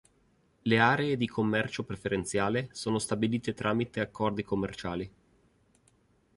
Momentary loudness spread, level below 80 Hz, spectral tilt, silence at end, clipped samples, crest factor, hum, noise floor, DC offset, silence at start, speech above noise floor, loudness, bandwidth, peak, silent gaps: 11 LU; -58 dBFS; -5.5 dB/octave; 1.3 s; under 0.1%; 22 dB; none; -68 dBFS; under 0.1%; 0.65 s; 38 dB; -30 LUFS; 11.5 kHz; -8 dBFS; none